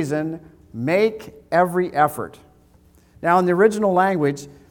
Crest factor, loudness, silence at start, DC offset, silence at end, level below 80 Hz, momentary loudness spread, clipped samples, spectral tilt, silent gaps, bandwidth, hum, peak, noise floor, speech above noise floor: 18 dB; -20 LUFS; 0 s; under 0.1%; 0.2 s; -58 dBFS; 17 LU; under 0.1%; -6.5 dB/octave; none; 19 kHz; none; -4 dBFS; -53 dBFS; 34 dB